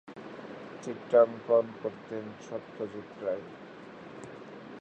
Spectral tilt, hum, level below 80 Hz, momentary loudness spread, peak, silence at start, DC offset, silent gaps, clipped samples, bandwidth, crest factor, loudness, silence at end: -6.5 dB/octave; none; -76 dBFS; 22 LU; -10 dBFS; 0.05 s; under 0.1%; none; under 0.1%; 8.6 kHz; 22 dB; -31 LUFS; 0 s